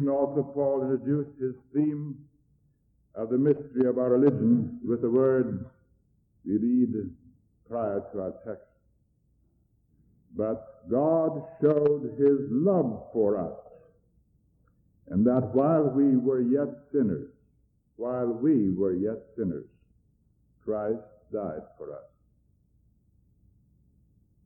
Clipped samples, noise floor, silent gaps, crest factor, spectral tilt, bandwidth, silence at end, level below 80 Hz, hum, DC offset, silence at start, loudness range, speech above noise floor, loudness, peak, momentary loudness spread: under 0.1%; -68 dBFS; none; 16 dB; -13.5 dB/octave; 3 kHz; 2.45 s; -64 dBFS; none; under 0.1%; 0 s; 12 LU; 42 dB; -27 LUFS; -12 dBFS; 17 LU